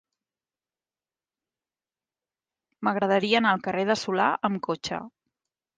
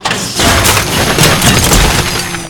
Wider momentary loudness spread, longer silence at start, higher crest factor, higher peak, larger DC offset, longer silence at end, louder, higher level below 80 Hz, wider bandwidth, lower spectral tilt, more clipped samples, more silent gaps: first, 9 LU vs 5 LU; first, 2.8 s vs 0 s; first, 20 dB vs 10 dB; second, -10 dBFS vs 0 dBFS; neither; first, 0.7 s vs 0 s; second, -25 LUFS vs -8 LUFS; second, -70 dBFS vs -20 dBFS; second, 9.4 kHz vs over 20 kHz; first, -5 dB/octave vs -3 dB/octave; second, under 0.1% vs 0.7%; neither